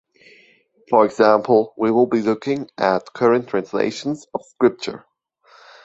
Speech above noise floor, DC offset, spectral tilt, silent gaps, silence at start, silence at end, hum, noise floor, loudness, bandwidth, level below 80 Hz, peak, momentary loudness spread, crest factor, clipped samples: 37 dB; under 0.1%; -6 dB/octave; none; 0.9 s; 0.85 s; none; -55 dBFS; -19 LUFS; 8 kHz; -64 dBFS; -2 dBFS; 13 LU; 18 dB; under 0.1%